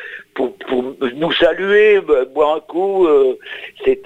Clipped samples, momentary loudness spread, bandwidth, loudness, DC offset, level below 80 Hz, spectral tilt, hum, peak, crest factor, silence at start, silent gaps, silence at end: under 0.1%; 11 LU; 7.4 kHz; -15 LUFS; under 0.1%; -48 dBFS; -6 dB/octave; none; -2 dBFS; 14 dB; 0 s; none; 0 s